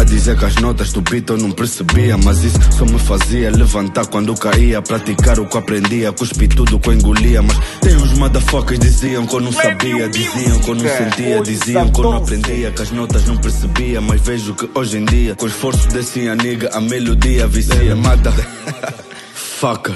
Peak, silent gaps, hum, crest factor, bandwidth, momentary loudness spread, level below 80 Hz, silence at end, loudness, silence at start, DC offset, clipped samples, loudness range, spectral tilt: 0 dBFS; none; none; 12 dB; 12.5 kHz; 6 LU; -16 dBFS; 0 s; -15 LUFS; 0 s; under 0.1%; under 0.1%; 3 LU; -5 dB/octave